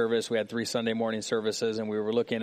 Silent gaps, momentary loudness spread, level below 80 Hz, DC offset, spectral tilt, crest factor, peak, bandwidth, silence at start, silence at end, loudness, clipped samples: none; 2 LU; -74 dBFS; under 0.1%; -4 dB/octave; 14 dB; -14 dBFS; 15 kHz; 0 s; 0 s; -29 LUFS; under 0.1%